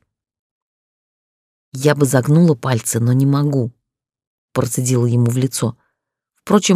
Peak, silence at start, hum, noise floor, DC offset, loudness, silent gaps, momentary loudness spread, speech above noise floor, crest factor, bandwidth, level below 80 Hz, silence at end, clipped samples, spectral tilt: -2 dBFS; 1.75 s; none; -79 dBFS; under 0.1%; -17 LUFS; 4.27-4.48 s; 9 LU; 64 dB; 16 dB; 15.5 kHz; -58 dBFS; 0 s; under 0.1%; -6 dB/octave